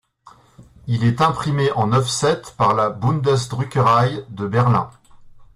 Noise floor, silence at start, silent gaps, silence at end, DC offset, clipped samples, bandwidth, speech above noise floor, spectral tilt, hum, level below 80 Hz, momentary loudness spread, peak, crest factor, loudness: -49 dBFS; 0.6 s; none; 0.1 s; under 0.1%; under 0.1%; 12 kHz; 31 dB; -6 dB/octave; none; -50 dBFS; 7 LU; -4 dBFS; 14 dB; -19 LUFS